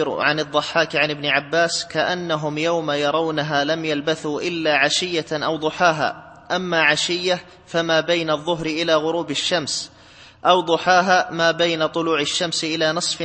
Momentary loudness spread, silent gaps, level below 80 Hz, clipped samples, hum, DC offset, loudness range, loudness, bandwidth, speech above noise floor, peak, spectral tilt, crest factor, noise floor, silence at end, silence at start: 7 LU; none; -60 dBFS; under 0.1%; none; under 0.1%; 2 LU; -20 LUFS; 8.8 kHz; 26 dB; -2 dBFS; -3 dB/octave; 18 dB; -46 dBFS; 0 s; 0 s